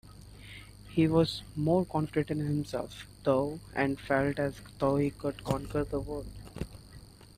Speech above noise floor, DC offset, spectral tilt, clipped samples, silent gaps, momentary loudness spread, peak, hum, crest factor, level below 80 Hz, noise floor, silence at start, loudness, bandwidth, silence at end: 21 dB; under 0.1%; -7 dB/octave; under 0.1%; none; 18 LU; -12 dBFS; 50 Hz at -50 dBFS; 20 dB; -50 dBFS; -52 dBFS; 0.05 s; -31 LUFS; 15 kHz; 0.3 s